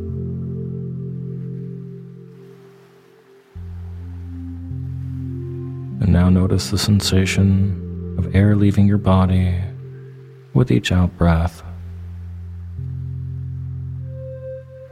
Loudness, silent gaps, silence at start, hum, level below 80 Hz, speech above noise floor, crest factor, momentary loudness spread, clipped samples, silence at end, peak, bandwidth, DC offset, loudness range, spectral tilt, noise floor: -20 LUFS; none; 0 s; none; -36 dBFS; 34 dB; 18 dB; 19 LU; under 0.1%; 0 s; -2 dBFS; 15 kHz; under 0.1%; 16 LU; -6.5 dB/octave; -49 dBFS